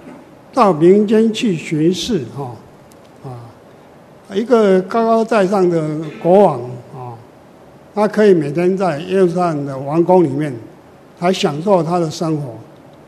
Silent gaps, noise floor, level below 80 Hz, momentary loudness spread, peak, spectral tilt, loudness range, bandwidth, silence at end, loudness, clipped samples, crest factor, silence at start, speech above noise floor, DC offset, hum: none; -42 dBFS; -56 dBFS; 19 LU; 0 dBFS; -6.5 dB/octave; 4 LU; 13 kHz; 0.45 s; -15 LUFS; under 0.1%; 16 dB; 0.05 s; 28 dB; under 0.1%; none